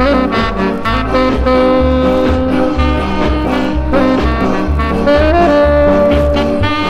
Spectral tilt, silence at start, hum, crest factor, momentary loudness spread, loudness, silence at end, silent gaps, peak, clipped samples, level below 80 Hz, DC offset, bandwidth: -7.5 dB/octave; 0 s; none; 12 dB; 5 LU; -12 LUFS; 0 s; none; 0 dBFS; under 0.1%; -20 dBFS; under 0.1%; 10.5 kHz